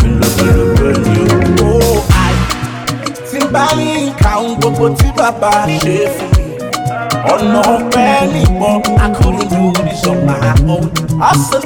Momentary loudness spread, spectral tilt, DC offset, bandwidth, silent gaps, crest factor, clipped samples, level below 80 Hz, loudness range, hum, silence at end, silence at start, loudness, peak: 7 LU; -5.5 dB/octave; 0.1%; 19.5 kHz; none; 10 dB; under 0.1%; -20 dBFS; 2 LU; none; 0 s; 0 s; -12 LUFS; 0 dBFS